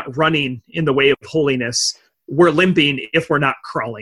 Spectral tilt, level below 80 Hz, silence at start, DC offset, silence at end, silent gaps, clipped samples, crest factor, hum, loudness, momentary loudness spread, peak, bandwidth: -4.5 dB/octave; -52 dBFS; 0 s; under 0.1%; 0 s; none; under 0.1%; 16 dB; none; -17 LUFS; 10 LU; -2 dBFS; 12 kHz